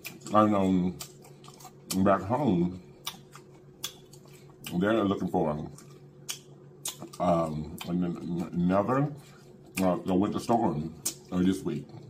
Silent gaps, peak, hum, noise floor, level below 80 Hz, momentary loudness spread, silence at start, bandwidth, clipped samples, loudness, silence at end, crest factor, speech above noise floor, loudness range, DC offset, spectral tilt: none; -8 dBFS; none; -51 dBFS; -58 dBFS; 18 LU; 0.05 s; 16 kHz; under 0.1%; -29 LUFS; 0 s; 22 dB; 24 dB; 4 LU; under 0.1%; -6 dB/octave